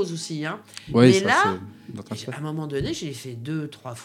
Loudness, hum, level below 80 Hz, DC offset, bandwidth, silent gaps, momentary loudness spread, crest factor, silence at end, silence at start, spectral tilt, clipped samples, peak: -23 LUFS; none; -54 dBFS; under 0.1%; 15 kHz; none; 19 LU; 22 dB; 0 s; 0 s; -5.5 dB/octave; under 0.1%; -2 dBFS